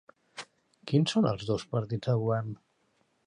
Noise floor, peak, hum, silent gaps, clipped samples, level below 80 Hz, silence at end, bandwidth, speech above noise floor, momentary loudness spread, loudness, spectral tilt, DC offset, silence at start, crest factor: -72 dBFS; -12 dBFS; none; none; under 0.1%; -62 dBFS; 0.7 s; 10.5 kHz; 43 dB; 21 LU; -29 LUFS; -6.5 dB/octave; under 0.1%; 0.35 s; 18 dB